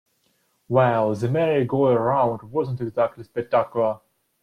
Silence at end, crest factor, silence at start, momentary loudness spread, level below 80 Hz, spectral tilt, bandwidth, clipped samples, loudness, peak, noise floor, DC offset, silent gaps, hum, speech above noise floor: 0.45 s; 16 dB; 0.7 s; 7 LU; -60 dBFS; -8.5 dB/octave; 11 kHz; under 0.1%; -22 LUFS; -6 dBFS; -67 dBFS; under 0.1%; none; none; 46 dB